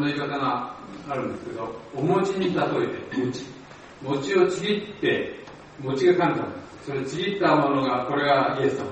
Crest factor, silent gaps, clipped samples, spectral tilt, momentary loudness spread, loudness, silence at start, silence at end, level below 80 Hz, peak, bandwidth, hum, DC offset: 18 dB; none; under 0.1%; -6 dB/octave; 15 LU; -25 LUFS; 0 s; 0 s; -60 dBFS; -6 dBFS; 8.4 kHz; none; under 0.1%